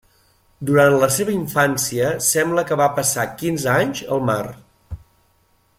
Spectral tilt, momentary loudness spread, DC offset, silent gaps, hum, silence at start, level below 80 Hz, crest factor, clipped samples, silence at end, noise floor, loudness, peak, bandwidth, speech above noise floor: -4 dB/octave; 17 LU; under 0.1%; none; none; 0.6 s; -50 dBFS; 18 dB; under 0.1%; 0.85 s; -60 dBFS; -18 LUFS; -2 dBFS; 16.5 kHz; 42 dB